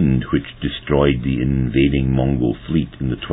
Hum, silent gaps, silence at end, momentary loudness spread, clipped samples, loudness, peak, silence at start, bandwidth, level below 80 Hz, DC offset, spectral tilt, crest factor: none; none; 0 s; 8 LU; under 0.1%; -19 LUFS; -2 dBFS; 0 s; 4 kHz; -30 dBFS; under 0.1%; -11.5 dB/octave; 16 dB